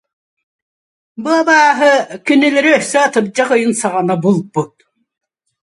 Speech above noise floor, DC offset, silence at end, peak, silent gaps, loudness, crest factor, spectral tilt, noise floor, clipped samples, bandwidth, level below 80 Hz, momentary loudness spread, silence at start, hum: over 78 dB; under 0.1%; 1 s; 0 dBFS; none; -13 LUFS; 14 dB; -4.5 dB/octave; under -90 dBFS; under 0.1%; 11.5 kHz; -64 dBFS; 9 LU; 1.2 s; none